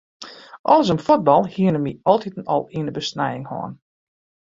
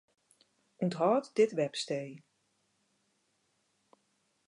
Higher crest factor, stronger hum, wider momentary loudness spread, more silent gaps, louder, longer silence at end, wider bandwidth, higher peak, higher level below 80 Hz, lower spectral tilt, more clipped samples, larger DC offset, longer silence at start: about the same, 18 dB vs 20 dB; neither; first, 16 LU vs 9 LU; first, 0.59-0.64 s vs none; first, -20 LUFS vs -32 LUFS; second, 0.75 s vs 2.3 s; second, 7.6 kHz vs 11.5 kHz; first, -2 dBFS vs -16 dBFS; first, -58 dBFS vs -88 dBFS; about the same, -6.5 dB/octave vs -5.5 dB/octave; neither; neither; second, 0.2 s vs 0.8 s